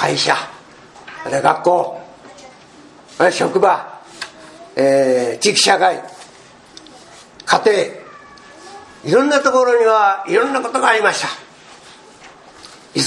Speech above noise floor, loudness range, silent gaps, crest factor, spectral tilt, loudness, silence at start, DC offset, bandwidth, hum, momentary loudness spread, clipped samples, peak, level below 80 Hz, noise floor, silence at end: 29 dB; 5 LU; none; 18 dB; -3 dB/octave; -15 LUFS; 0 s; under 0.1%; 12 kHz; none; 20 LU; under 0.1%; 0 dBFS; -64 dBFS; -43 dBFS; 0 s